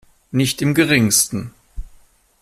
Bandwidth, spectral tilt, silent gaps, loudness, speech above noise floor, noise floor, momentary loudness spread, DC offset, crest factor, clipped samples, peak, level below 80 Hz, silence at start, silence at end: 16 kHz; -3.5 dB/octave; none; -16 LUFS; 33 dB; -50 dBFS; 14 LU; under 0.1%; 18 dB; under 0.1%; -2 dBFS; -38 dBFS; 0.35 s; 0.55 s